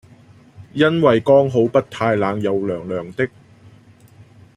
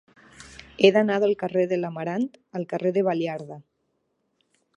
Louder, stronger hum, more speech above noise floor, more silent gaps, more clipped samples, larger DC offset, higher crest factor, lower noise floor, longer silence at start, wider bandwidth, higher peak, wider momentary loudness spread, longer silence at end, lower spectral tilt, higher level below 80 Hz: first, -18 LUFS vs -24 LUFS; neither; second, 30 dB vs 51 dB; neither; neither; neither; about the same, 18 dB vs 22 dB; second, -47 dBFS vs -74 dBFS; first, 0.6 s vs 0.4 s; about the same, 10.5 kHz vs 10 kHz; about the same, -2 dBFS vs -4 dBFS; second, 11 LU vs 24 LU; first, 1.3 s vs 1.15 s; about the same, -7.5 dB/octave vs -6.5 dB/octave; first, -58 dBFS vs -64 dBFS